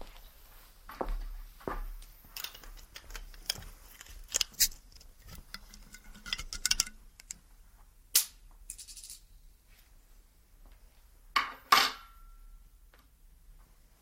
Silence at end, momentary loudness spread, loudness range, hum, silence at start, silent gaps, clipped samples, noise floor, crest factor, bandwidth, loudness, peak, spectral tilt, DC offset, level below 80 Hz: 0.4 s; 25 LU; 9 LU; none; 0 s; none; under 0.1%; -59 dBFS; 32 dB; 16.5 kHz; -32 LUFS; -6 dBFS; 0 dB/octave; under 0.1%; -48 dBFS